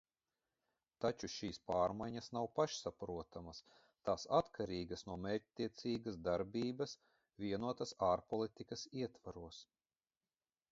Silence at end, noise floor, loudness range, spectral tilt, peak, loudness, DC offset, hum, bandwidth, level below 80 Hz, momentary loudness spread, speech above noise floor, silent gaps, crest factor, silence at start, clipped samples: 1.1 s; under -90 dBFS; 2 LU; -5 dB/octave; -20 dBFS; -42 LUFS; under 0.1%; none; 7.6 kHz; -68 dBFS; 14 LU; over 48 dB; none; 24 dB; 1 s; under 0.1%